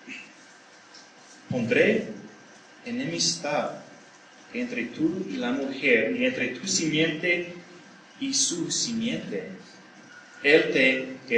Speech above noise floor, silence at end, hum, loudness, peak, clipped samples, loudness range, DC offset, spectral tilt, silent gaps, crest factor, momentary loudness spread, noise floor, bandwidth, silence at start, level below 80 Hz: 26 dB; 0 s; none; -25 LUFS; -4 dBFS; under 0.1%; 5 LU; under 0.1%; -3 dB/octave; none; 24 dB; 18 LU; -51 dBFS; 10 kHz; 0.05 s; -74 dBFS